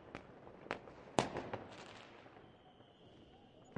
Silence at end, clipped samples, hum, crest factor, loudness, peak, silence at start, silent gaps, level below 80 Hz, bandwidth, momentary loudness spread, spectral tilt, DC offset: 0 s; under 0.1%; none; 34 dB; -45 LUFS; -12 dBFS; 0 s; none; -70 dBFS; 10.5 kHz; 23 LU; -4.5 dB/octave; under 0.1%